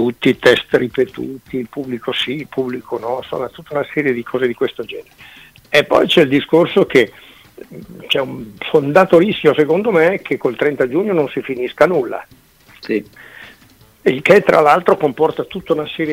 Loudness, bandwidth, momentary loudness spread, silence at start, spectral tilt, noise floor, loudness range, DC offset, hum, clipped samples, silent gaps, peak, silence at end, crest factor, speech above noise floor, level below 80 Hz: -15 LUFS; 16 kHz; 14 LU; 0 s; -6 dB/octave; -48 dBFS; 6 LU; under 0.1%; none; under 0.1%; none; 0 dBFS; 0 s; 16 dB; 32 dB; -52 dBFS